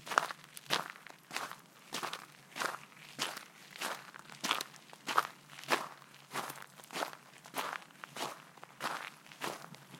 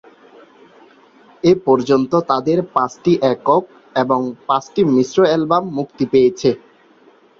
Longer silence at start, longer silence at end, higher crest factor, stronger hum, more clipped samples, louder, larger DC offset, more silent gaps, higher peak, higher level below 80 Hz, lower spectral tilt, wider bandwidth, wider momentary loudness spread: second, 0 s vs 1.45 s; second, 0 s vs 0.8 s; first, 34 dB vs 16 dB; neither; neither; second, -40 LUFS vs -16 LUFS; neither; neither; second, -8 dBFS vs -2 dBFS; second, under -90 dBFS vs -56 dBFS; second, -1.5 dB/octave vs -6.5 dB/octave; first, 16.5 kHz vs 7.4 kHz; first, 15 LU vs 6 LU